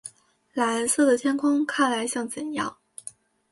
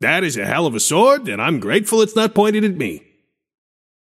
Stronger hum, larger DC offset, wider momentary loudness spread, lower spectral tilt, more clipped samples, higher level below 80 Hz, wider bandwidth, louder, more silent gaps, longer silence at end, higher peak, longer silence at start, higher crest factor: neither; neither; first, 20 LU vs 7 LU; second, -2.5 dB/octave vs -4 dB/octave; neither; second, -70 dBFS vs -62 dBFS; second, 12 kHz vs 16 kHz; second, -24 LUFS vs -16 LUFS; neither; second, 0.4 s vs 1.05 s; second, -10 dBFS vs 0 dBFS; about the same, 0.05 s vs 0 s; about the same, 16 dB vs 16 dB